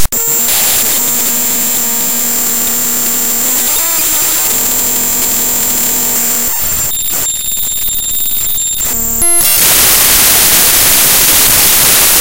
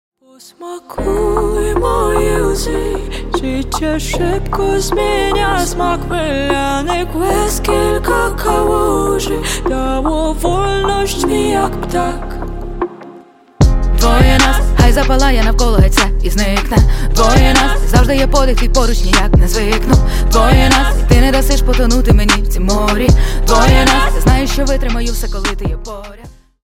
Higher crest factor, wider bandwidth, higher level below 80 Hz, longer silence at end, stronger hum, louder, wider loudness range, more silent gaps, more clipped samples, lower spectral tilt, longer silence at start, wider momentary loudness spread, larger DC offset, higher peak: about the same, 10 dB vs 12 dB; first, over 20 kHz vs 16.5 kHz; second, -32 dBFS vs -14 dBFS; second, 0 s vs 0.35 s; neither; first, -7 LUFS vs -13 LUFS; about the same, 5 LU vs 4 LU; neither; first, 0.7% vs under 0.1%; second, 0 dB/octave vs -5 dB/octave; second, 0 s vs 0.6 s; about the same, 7 LU vs 9 LU; first, 4% vs under 0.1%; about the same, 0 dBFS vs 0 dBFS